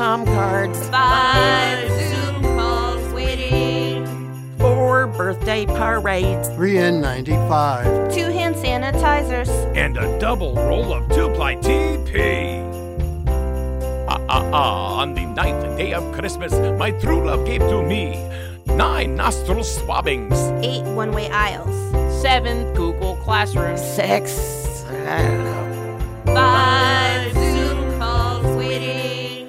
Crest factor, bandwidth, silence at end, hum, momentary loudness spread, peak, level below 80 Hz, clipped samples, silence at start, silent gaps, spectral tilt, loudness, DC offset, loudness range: 16 dB; 16 kHz; 0 s; none; 9 LU; -2 dBFS; -26 dBFS; under 0.1%; 0 s; none; -5.5 dB/octave; -19 LUFS; under 0.1%; 3 LU